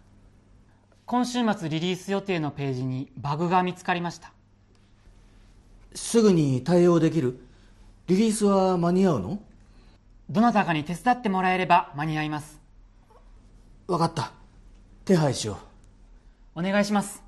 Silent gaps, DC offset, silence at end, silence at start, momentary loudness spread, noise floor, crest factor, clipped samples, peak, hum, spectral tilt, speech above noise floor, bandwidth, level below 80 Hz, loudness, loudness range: none; under 0.1%; 0 s; 1.1 s; 14 LU; -58 dBFS; 20 dB; under 0.1%; -6 dBFS; none; -6 dB/octave; 34 dB; 12.5 kHz; -54 dBFS; -24 LUFS; 6 LU